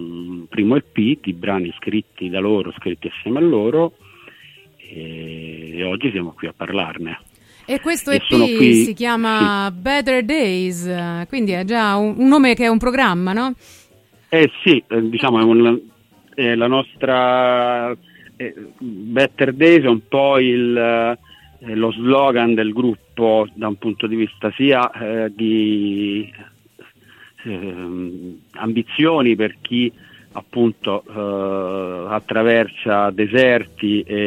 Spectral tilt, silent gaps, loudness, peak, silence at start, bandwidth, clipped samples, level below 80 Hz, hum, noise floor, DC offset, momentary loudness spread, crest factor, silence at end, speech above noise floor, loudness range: -5.5 dB/octave; none; -17 LUFS; 0 dBFS; 0 s; 15.5 kHz; under 0.1%; -50 dBFS; none; -52 dBFS; under 0.1%; 16 LU; 18 dB; 0 s; 35 dB; 7 LU